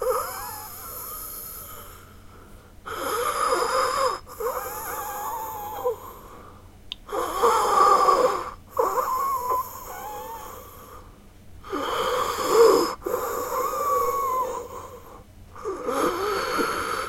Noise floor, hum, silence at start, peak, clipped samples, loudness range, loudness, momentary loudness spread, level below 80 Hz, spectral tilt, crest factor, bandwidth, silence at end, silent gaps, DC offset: -47 dBFS; none; 0 s; -6 dBFS; under 0.1%; 8 LU; -25 LUFS; 21 LU; -50 dBFS; -3 dB/octave; 20 dB; 16.5 kHz; 0 s; none; under 0.1%